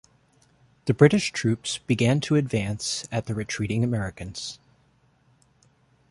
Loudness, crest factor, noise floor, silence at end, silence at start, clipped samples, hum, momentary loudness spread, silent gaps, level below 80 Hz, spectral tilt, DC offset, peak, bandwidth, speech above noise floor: -25 LUFS; 24 dB; -63 dBFS; 1.55 s; 0.85 s; under 0.1%; none; 15 LU; none; -52 dBFS; -5.5 dB/octave; under 0.1%; -2 dBFS; 11.5 kHz; 39 dB